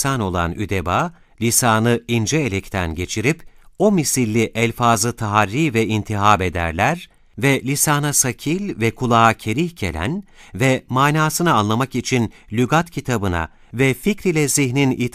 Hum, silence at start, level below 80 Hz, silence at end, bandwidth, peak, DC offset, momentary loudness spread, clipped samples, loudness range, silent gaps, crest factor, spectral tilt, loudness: none; 0 s; -44 dBFS; 0.05 s; 15.5 kHz; 0 dBFS; under 0.1%; 8 LU; under 0.1%; 2 LU; none; 18 dB; -4.5 dB/octave; -18 LUFS